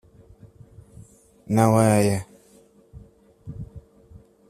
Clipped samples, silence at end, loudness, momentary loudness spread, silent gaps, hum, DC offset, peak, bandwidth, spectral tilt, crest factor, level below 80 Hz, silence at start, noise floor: under 0.1%; 0.7 s; -20 LUFS; 26 LU; none; none; under 0.1%; -4 dBFS; 14.5 kHz; -6.5 dB/octave; 22 dB; -52 dBFS; 1.5 s; -55 dBFS